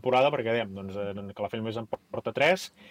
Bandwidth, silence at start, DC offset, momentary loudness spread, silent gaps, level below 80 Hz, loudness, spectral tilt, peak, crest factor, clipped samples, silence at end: 16 kHz; 0.05 s; under 0.1%; 12 LU; none; -68 dBFS; -29 LUFS; -5 dB/octave; -12 dBFS; 18 dB; under 0.1%; 0 s